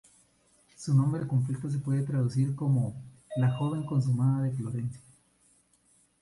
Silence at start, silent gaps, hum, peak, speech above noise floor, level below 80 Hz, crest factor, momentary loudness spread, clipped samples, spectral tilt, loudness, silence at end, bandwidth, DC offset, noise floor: 0.8 s; none; 60 Hz at -50 dBFS; -14 dBFS; 39 dB; -64 dBFS; 14 dB; 11 LU; under 0.1%; -8.5 dB/octave; -29 LUFS; 1.25 s; 11.5 kHz; under 0.1%; -66 dBFS